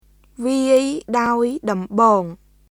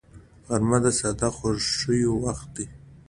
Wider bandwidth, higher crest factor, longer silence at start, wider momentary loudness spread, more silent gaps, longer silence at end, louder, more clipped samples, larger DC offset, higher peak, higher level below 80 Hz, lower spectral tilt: first, 15.5 kHz vs 11.5 kHz; about the same, 18 dB vs 20 dB; first, 0.4 s vs 0.15 s; second, 8 LU vs 13 LU; neither; first, 0.35 s vs 0.1 s; first, -18 LUFS vs -24 LUFS; neither; neither; first, -2 dBFS vs -6 dBFS; second, -54 dBFS vs -44 dBFS; about the same, -5.5 dB/octave vs -4.5 dB/octave